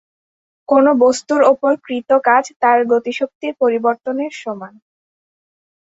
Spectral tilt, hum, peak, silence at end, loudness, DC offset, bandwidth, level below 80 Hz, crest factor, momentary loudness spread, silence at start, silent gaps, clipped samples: -4 dB/octave; none; -2 dBFS; 1.25 s; -15 LUFS; under 0.1%; 8 kHz; -64 dBFS; 16 dB; 10 LU; 0.7 s; 2.56-2.60 s, 3.35-3.41 s; under 0.1%